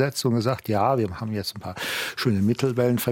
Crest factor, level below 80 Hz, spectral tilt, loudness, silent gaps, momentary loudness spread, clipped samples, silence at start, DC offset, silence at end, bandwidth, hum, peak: 14 dB; -60 dBFS; -5.5 dB/octave; -24 LUFS; none; 7 LU; under 0.1%; 0 s; under 0.1%; 0 s; 17 kHz; none; -8 dBFS